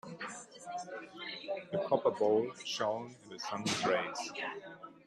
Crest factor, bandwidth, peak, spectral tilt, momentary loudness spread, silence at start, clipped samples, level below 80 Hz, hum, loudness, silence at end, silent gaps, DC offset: 20 dB; 13 kHz; -16 dBFS; -3.5 dB/octave; 14 LU; 0.05 s; under 0.1%; -80 dBFS; none; -36 LUFS; 0.1 s; none; under 0.1%